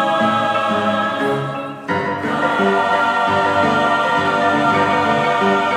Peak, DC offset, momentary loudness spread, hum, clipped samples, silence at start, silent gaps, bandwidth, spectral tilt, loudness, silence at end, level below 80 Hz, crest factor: -2 dBFS; under 0.1%; 5 LU; none; under 0.1%; 0 s; none; 14.5 kHz; -5.5 dB/octave; -16 LUFS; 0 s; -58 dBFS; 14 dB